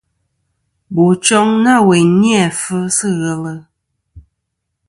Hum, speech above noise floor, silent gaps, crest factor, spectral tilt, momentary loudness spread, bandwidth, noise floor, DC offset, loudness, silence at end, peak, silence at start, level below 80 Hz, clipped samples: none; 61 dB; none; 14 dB; -4.5 dB/octave; 12 LU; 11.5 kHz; -73 dBFS; under 0.1%; -12 LUFS; 0.7 s; 0 dBFS; 0.9 s; -52 dBFS; under 0.1%